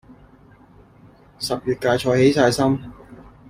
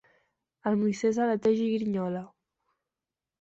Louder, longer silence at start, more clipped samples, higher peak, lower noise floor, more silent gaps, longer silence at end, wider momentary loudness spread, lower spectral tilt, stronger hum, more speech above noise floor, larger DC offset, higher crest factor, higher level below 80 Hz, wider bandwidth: first, -19 LUFS vs -28 LUFS; first, 1.4 s vs 0.65 s; neither; first, -4 dBFS vs -14 dBFS; second, -49 dBFS vs under -90 dBFS; neither; second, 0.35 s vs 1.1 s; first, 12 LU vs 9 LU; second, -5.5 dB/octave vs -7 dB/octave; neither; second, 31 dB vs over 63 dB; neither; about the same, 18 dB vs 16 dB; first, -50 dBFS vs -70 dBFS; first, 16 kHz vs 8 kHz